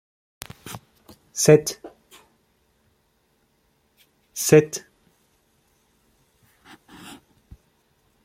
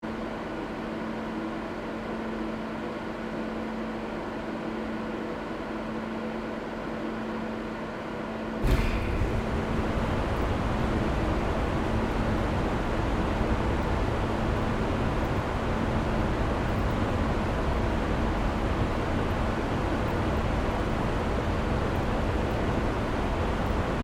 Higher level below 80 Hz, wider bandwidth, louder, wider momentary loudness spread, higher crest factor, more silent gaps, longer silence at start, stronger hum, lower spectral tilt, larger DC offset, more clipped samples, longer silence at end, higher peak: second, -60 dBFS vs -34 dBFS; about the same, 16 kHz vs 15.5 kHz; first, -19 LUFS vs -30 LUFS; first, 27 LU vs 6 LU; first, 26 dB vs 16 dB; neither; first, 0.65 s vs 0 s; neither; second, -4.5 dB/octave vs -7 dB/octave; neither; neither; first, 3.45 s vs 0 s; first, -2 dBFS vs -12 dBFS